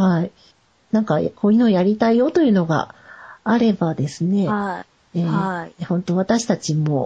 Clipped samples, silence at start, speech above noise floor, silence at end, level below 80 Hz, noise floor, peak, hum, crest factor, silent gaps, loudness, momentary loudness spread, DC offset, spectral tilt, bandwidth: under 0.1%; 0 s; 37 dB; 0 s; -58 dBFS; -56 dBFS; -6 dBFS; none; 14 dB; none; -19 LUFS; 11 LU; under 0.1%; -7 dB/octave; 9.2 kHz